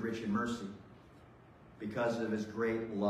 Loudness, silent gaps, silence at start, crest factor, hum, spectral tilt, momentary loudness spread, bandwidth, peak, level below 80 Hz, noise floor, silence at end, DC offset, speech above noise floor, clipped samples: -37 LUFS; none; 0 s; 16 dB; none; -6.5 dB/octave; 18 LU; 13 kHz; -22 dBFS; -66 dBFS; -58 dBFS; 0 s; under 0.1%; 23 dB; under 0.1%